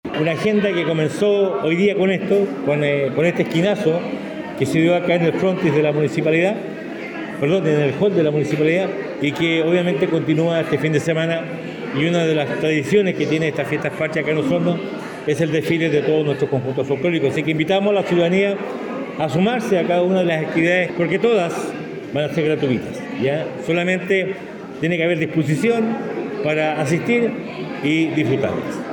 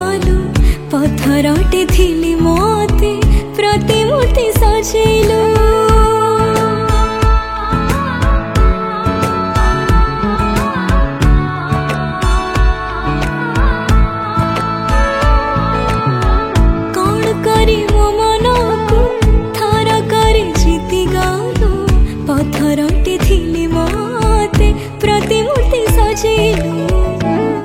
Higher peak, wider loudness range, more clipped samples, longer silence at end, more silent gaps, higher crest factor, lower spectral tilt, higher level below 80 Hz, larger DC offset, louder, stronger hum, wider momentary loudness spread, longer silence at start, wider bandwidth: second, -4 dBFS vs 0 dBFS; about the same, 2 LU vs 3 LU; neither; about the same, 0 s vs 0 s; neither; about the same, 14 dB vs 12 dB; about the same, -6.5 dB/octave vs -6 dB/octave; second, -60 dBFS vs -16 dBFS; neither; second, -19 LUFS vs -13 LUFS; neither; first, 8 LU vs 4 LU; about the same, 0.05 s vs 0 s; about the same, 17 kHz vs 16 kHz